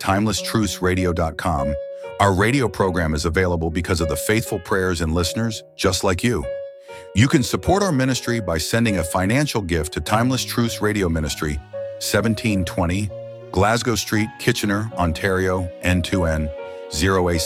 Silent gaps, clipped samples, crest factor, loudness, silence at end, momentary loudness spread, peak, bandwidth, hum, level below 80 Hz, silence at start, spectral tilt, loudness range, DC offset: none; under 0.1%; 20 dB; -21 LUFS; 0 s; 7 LU; -2 dBFS; 16.5 kHz; none; -36 dBFS; 0 s; -5 dB/octave; 2 LU; under 0.1%